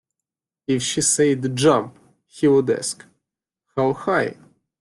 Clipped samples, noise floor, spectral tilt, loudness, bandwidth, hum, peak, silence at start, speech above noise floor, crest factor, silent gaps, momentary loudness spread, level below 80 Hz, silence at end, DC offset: under 0.1%; -86 dBFS; -4 dB/octave; -20 LUFS; 12.5 kHz; none; -4 dBFS; 0.7 s; 67 dB; 18 dB; none; 13 LU; -60 dBFS; 0.5 s; under 0.1%